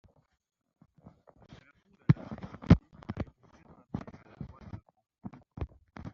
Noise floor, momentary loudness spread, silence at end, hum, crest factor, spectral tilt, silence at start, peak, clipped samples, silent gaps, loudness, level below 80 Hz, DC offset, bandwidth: -65 dBFS; 24 LU; 0.05 s; none; 28 dB; -8.5 dB/octave; 2.1 s; -8 dBFS; under 0.1%; none; -32 LUFS; -48 dBFS; under 0.1%; 6.6 kHz